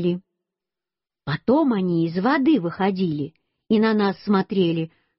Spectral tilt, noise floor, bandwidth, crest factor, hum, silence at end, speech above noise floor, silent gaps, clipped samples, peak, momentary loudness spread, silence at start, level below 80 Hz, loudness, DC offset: -6 dB/octave; under -90 dBFS; 5.8 kHz; 14 dB; none; 0.3 s; over 69 dB; none; under 0.1%; -8 dBFS; 11 LU; 0 s; -60 dBFS; -22 LUFS; under 0.1%